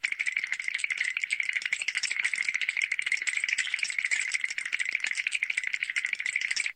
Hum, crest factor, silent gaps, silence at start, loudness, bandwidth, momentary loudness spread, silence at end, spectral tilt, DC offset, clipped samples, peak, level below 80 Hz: none; 18 dB; none; 0.05 s; -28 LUFS; 15.5 kHz; 2 LU; 0.05 s; 4 dB/octave; under 0.1%; under 0.1%; -14 dBFS; -80 dBFS